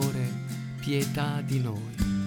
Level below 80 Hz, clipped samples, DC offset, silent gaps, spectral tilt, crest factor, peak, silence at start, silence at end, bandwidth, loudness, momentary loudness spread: -44 dBFS; under 0.1%; under 0.1%; none; -6 dB/octave; 16 dB; -14 dBFS; 0 s; 0 s; 19 kHz; -30 LUFS; 6 LU